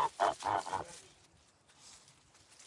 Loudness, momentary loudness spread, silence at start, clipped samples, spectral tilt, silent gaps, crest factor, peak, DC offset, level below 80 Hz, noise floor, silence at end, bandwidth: -36 LUFS; 25 LU; 0 s; under 0.1%; -3 dB/octave; none; 22 dB; -18 dBFS; under 0.1%; -74 dBFS; -66 dBFS; 0 s; 11.5 kHz